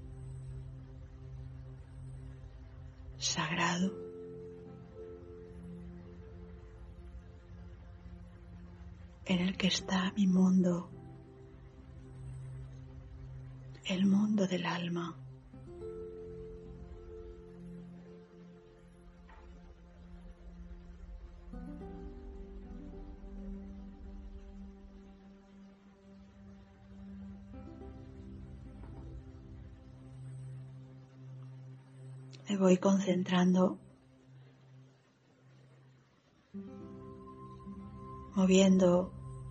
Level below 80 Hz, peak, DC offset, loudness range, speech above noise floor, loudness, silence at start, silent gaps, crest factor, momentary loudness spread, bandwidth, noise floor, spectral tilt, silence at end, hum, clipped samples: -54 dBFS; -14 dBFS; under 0.1%; 21 LU; 38 dB; -32 LUFS; 0 s; none; 24 dB; 25 LU; 8.2 kHz; -67 dBFS; -5.5 dB/octave; 0 s; none; under 0.1%